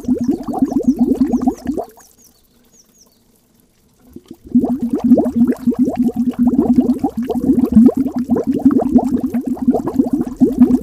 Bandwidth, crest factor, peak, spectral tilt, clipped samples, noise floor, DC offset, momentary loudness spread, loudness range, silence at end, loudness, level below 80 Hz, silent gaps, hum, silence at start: 13.5 kHz; 16 dB; 0 dBFS; -8.5 dB/octave; under 0.1%; -54 dBFS; under 0.1%; 7 LU; 10 LU; 0 s; -15 LUFS; -40 dBFS; none; none; 0 s